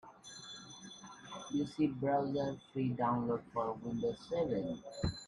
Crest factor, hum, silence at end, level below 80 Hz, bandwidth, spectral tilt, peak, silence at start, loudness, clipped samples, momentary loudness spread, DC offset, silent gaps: 16 dB; none; 0 s; -60 dBFS; 11.5 kHz; -6.5 dB/octave; -22 dBFS; 0.05 s; -37 LUFS; under 0.1%; 16 LU; under 0.1%; none